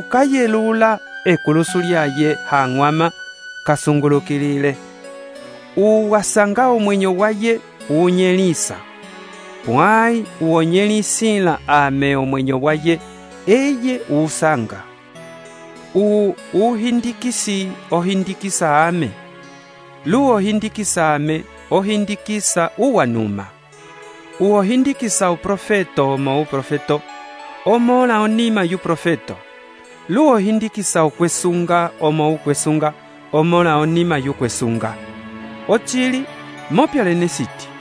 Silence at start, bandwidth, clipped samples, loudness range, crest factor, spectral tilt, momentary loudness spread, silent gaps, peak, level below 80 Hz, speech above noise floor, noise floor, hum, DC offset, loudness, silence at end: 0 s; 11 kHz; under 0.1%; 3 LU; 16 dB; -5 dB/octave; 17 LU; none; 0 dBFS; -54 dBFS; 25 dB; -41 dBFS; none; under 0.1%; -17 LUFS; 0 s